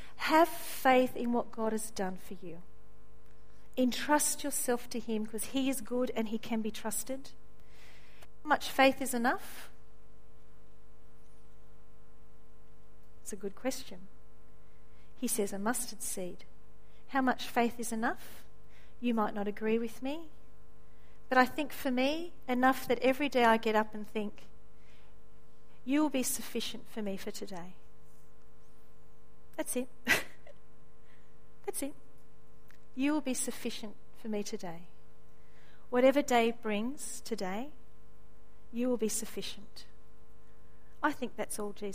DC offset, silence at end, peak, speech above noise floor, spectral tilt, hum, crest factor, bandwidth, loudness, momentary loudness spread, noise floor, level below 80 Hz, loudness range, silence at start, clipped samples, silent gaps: 1%; 0 s; -10 dBFS; 30 dB; -3 dB/octave; none; 26 dB; 15.5 kHz; -33 LUFS; 19 LU; -62 dBFS; -62 dBFS; 9 LU; 0 s; under 0.1%; none